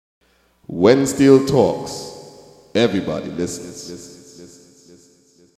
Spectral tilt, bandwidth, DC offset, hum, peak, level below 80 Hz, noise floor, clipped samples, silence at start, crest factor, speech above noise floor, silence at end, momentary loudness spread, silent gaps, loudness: -5.5 dB/octave; 14.5 kHz; under 0.1%; none; 0 dBFS; -52 dBFS; -54 dBFS; under 0.1%; 0.7 s; 20 dB; 37 dB; 1.1 s; 22 LU; none; -17 LUFS